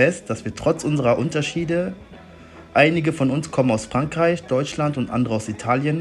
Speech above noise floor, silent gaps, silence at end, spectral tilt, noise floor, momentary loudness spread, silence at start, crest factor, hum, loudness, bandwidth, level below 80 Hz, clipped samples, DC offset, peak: 22 dB; none; 0 s; -6 dB/octave; -43 dBFS; 7 LU; 0 s; 20 dB; none; -21 LUFS; 11.5 kHz; -50 dBFS; under 0.1%; under 0.1%; -2 dBFS